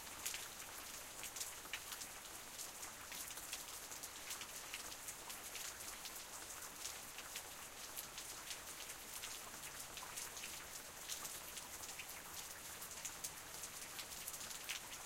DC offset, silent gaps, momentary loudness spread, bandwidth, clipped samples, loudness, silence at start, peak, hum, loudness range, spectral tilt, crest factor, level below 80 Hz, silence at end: under 0.1%; none; 3 LU; 17 kHz; under 0.1%; -48 LUFS; 0 s; -26 dBFS; none; 1 LU; 0 dB/octave; 24 dB; -72 dBFS; 0 s